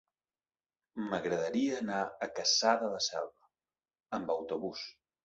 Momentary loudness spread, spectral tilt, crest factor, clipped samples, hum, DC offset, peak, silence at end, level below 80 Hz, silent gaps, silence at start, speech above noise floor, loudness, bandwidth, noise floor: 15 LU; -2 dB/octave; 22 dB; under 0.1%; none; under 0.1%; -12 dBFS; 0.35 s; -74 dBFS; none; 0.95 s; over 56 dB; -33 LUFS; 8 kHz; under -90 dBFS